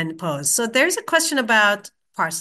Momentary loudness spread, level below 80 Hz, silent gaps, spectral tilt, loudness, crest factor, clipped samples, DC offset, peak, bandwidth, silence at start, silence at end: 10 LU; -72 dBFS; none; -2 dB/octave; -19 LUFS; 18 dB; under 0.1%; under 0.1%; -2 dBFS; 13 kHz; 0 s; 0 s